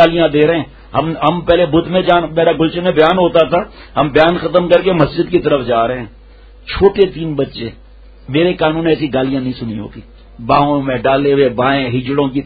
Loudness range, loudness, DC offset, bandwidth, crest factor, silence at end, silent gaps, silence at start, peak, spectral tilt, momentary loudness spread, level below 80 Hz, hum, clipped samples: 4 LU; -13 LUFS; under 0.1%; 5.8 kHz; 14 dB; 0 s; none; 0 s; 0 dBFS; -8.5 dB/octave; 10 LU; -36 dBFS; none; under 0.1%